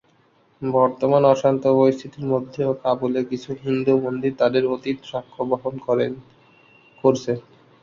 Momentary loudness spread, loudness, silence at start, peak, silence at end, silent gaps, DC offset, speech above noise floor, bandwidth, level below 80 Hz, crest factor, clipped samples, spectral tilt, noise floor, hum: 11 LU; -21 LUFS; 0.6 s; -2 dBFS; 0.4 s; none; under 0.1%; 39 dB; 7.4 kHz; -62 dBFS; 18 dB; under 0.1%; -7.5 dB/octave; -59 dBFS; none